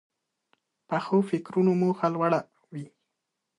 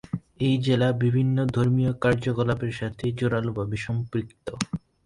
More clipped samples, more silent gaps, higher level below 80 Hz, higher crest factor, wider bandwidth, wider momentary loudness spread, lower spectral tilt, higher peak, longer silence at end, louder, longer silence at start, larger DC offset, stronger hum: neither; neither; second, -74 dBFS vs -50 dBFS; about the same, 18 dB vs 20 dB; about the same, 10.5 kHz vs 11 kHz; first, 18 LU vs 9 LU; first, -8.5 dB/octave vs -7 dB/octave; second, -10 dBFS vs -4 dBFS; first, 0.75 s vs 0.3 s; about the same, -26 LUFS vs -25 LUFS; first, 0.9 s vs 0.15 s; neither; neither